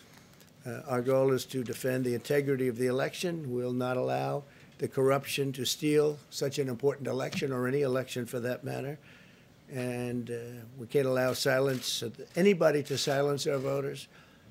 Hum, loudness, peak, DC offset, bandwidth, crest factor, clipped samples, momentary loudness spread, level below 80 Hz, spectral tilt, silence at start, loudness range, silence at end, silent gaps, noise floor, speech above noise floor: none; -31 LUFS; -12 dBFS; under 0.1%; 16 kHz; 20 dB; under 0.1%; 12 LU; -72 dBFS; -5 dB/octave; 0.1 s; 5 LU; 0 s; none; -57 dBFS; 27 dB